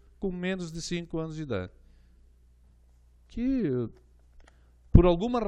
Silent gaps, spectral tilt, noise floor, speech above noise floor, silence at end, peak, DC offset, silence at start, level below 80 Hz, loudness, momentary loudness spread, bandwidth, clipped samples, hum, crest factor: none; -7.5 dB/octave; -59 dBFS; 29 dB; 0 s; -4 dBFS; under 0.1%; 0.2 s; -36 dBFS; -28 LUFS; 14 LU; 10 kHz; under 0.1%; 60 Hz at -55 dBFS; 26 dB